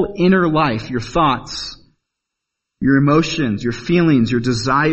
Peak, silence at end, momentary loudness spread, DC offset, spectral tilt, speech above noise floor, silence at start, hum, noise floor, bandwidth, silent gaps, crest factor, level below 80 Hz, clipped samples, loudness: -2 dBFS; 0 s; 9 LU; under 0.1%; -6 dB/octave; 64 dB; 0 s; none; -80 dBFS; 8.4 kHz; none; 16 dB; -40 dBFS; under 0.1%; -16 LUFS